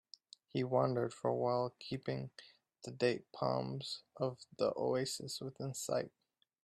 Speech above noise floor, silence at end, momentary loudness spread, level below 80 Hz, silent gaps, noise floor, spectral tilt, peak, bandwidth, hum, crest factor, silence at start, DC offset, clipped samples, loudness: 24 dB; 0.55 s; 15 LU; -76 dBFS; none; -62 dBFS; -5 dB/octave; -18 dBFS; 13.5 kHz; none; 20 dB; 0.55 s; under 0.1%; under 0.1%; -38 LUFS